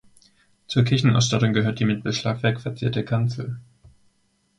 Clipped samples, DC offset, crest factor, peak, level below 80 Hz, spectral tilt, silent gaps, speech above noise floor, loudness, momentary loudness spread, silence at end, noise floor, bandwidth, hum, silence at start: under 0.1%; under 0.1%; 18 dB; -6 dBFS; -54 dBFS; -5.5 dB/octave; none; 45 dB; -22 LUFS; 8 LU; 0.95 s; -66 dBFS; 9.6 kHz; none; 0.7 s